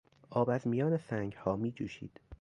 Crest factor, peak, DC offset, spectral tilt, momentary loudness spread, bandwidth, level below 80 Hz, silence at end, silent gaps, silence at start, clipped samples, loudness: 18 dB; -16 dBFS; under 0.1%; -8.5 dB/octave; 11 LU; 10.5 kHz; -62 dBFS; 0.05 s; none; 0.3 s; under 0.1%; -35 LUFS